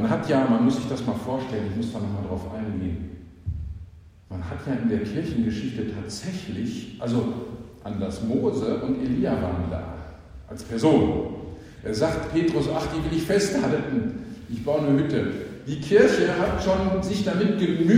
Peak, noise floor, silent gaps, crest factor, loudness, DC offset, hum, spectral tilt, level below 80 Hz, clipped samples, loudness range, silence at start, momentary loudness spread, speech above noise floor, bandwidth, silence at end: -2 dBFS; -45 dBFS; none; 22 dB; -25 LUFS; under 0.1%; none; -6.5 dB/octave; -44 dBFS; under 0.1%; 7 LU; 0 s; 15 LU; 22 dB; 15 kHz; 0 s